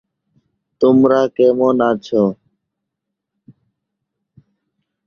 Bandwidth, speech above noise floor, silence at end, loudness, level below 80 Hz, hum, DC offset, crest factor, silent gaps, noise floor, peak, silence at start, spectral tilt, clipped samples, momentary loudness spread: 6.8 kHz; 66 dB; 2.75 s; -14 LUFS; -58 dBFS; none; under 0.1%; 18 dB; none; -79 dBFS; 0 dBFS; 0.8 s; -8 dB/octave; under 0.1%; 6 LU